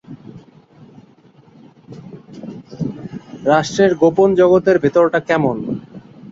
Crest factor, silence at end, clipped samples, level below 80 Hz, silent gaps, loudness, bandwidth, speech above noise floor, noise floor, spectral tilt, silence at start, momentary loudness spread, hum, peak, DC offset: 16 dB; 0.05 s; under 0.1%; -54 dBFS; none; -15 LUFS; 7.8 kHz; 35 dB; -48 dBFS; -6.5 dB/octave; 0.1 s; 24 LU; none; -2 dBFS; under 0.1%